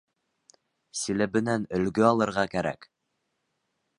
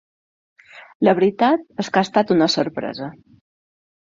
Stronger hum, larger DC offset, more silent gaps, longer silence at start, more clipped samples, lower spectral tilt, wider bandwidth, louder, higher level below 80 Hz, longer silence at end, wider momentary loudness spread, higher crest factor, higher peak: neither; neither; second, none vs 0.95-1.00 s; first, 0.95 s vs 0.75 s; neither; about the same, -5 dB/octave vs -5.5 dB/octave; first, 11.5 kHz vs 7.6 kHz; second, -27 LUFS vs -19 LUFS; about the same, -60 dBFS vs -62 dBFS; first, 1.15 s vs 1 s; about the same, 11 LU vs 12 LU; about the same, 22 dB vs 18 dB; second, -6 dBFS vs -2 dBFS